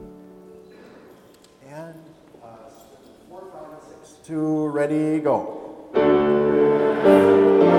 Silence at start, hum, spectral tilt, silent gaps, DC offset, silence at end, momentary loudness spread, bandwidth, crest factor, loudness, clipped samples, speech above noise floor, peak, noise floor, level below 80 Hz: 0 s; none; -7.5 dB/octave; none; under 0.1%; 0 s; 26 LU; 11 kHz; 18 dB; -19 LUFS; under 0.1%; 32 dB; -4 dBFS; -51 dBFS; -58 dBFS